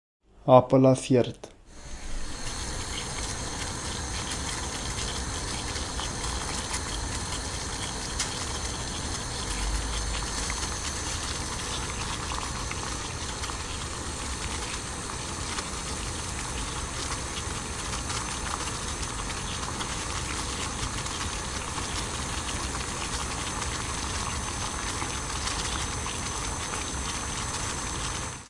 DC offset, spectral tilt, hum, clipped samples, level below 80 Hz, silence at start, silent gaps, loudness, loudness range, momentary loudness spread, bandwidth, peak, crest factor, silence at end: under 0.1%; -3.5 dB/octave; none; under 0.1%; -40 dBFS; 0.35 s; none; -30 LUFS; 2 LU; 3 LU; 11.5 kHz; -4 dBFS; 26 dB; 0 s